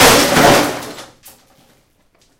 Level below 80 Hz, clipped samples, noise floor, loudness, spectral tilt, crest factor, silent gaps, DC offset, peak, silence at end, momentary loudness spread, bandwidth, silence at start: -38 dBFS; 0.1%; -56 dBFS; -10 LUFS; -2.5 dB/octave; 14 dB; none; under 0.1%; 0 dBFS; 1.35 s; 23 LU; over 20 kHz; 0 s